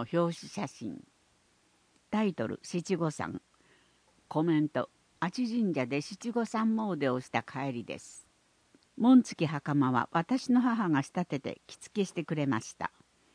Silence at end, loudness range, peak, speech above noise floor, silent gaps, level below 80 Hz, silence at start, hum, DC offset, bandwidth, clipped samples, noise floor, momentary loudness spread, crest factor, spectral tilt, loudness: 0.45 s; 8 LU; -12 dBFS; 38 dB; none; -74 dBFS; 0 s; none; under 0.1%; 10.5 kHz; under 0.1%; -69 dBFS; 13 LU; 20 dB; -6.5 dB/octave; -31 LUFS